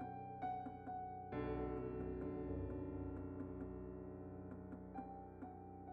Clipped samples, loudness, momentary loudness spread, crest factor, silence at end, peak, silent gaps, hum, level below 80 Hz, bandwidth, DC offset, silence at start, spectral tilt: under 0.1%; -49 LUFS; 8 LU; 14 dB; 0 s; -32 dBFS; none; none; -58 dBFS; 4.8 kHz; under 0.1%; 0 s; -8.5 dB/octave